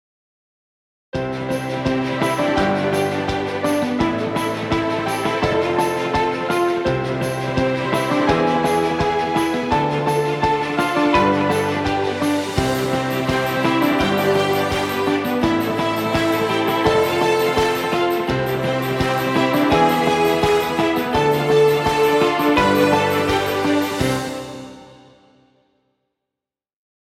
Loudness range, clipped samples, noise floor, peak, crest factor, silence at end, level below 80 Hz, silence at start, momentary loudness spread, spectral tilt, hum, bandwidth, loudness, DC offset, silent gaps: 4 LU; under 0.1%; -86 dBFS; -2 dBFS; 16 dB; 2.15 s; -42 dBFS; 1.15 s; 6 LU; -5.5 dB/octave; none; 17 kHz; -19 LUFS; under 0.1%; none